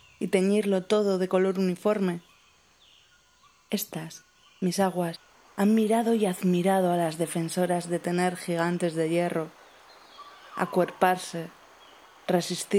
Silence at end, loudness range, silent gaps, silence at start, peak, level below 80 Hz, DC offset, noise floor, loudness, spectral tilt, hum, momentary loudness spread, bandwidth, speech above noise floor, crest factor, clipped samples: 0 s; 7 LU; none; 0.2 s; -6 dBFS; -76 dBFS; under 0.1%; -61 dBFS; -26 LUFS; -5.5 dB/octave; none; 16 LU; 16 kHz; 35 dB; 20 dB; under 0.1%